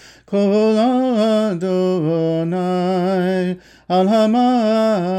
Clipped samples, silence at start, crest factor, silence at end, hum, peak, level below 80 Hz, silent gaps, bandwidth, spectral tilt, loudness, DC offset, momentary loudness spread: under 0.1%; 0.3 s; 10 dB; 0 s; none; -6 dBFS; -58 dBFS; none; 9.6 kHz; -7.5 dB/octave; -17 LUFS; under 0.1%; 5 LU